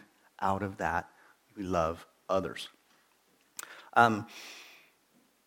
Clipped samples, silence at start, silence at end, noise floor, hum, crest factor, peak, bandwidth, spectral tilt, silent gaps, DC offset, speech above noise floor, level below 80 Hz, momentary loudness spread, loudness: under 0.1%; 0.4 s; 0.8 s; -69 dBFS; none; 26 dB; -8 dBFS; 17.5 kHz; -5 dB/octave; none; under 0.1%; 38 dB; -60 dBFS; 21 LU; -31 LUFS